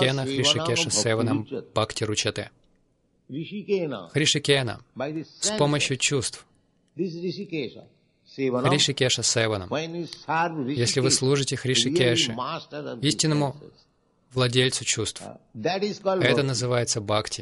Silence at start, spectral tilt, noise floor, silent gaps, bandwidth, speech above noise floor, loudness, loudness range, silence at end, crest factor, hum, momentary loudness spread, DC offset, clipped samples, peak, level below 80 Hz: 0 s; -3.5 dB/octave; -67 dBFS; none; 11.5 kHz; 42 dB; -24 LUFS; 4 LU; 0 s; 20 dB; none; 13 LU; under 0.1%; under 0.1%; -4 dBFS; -60 dBFS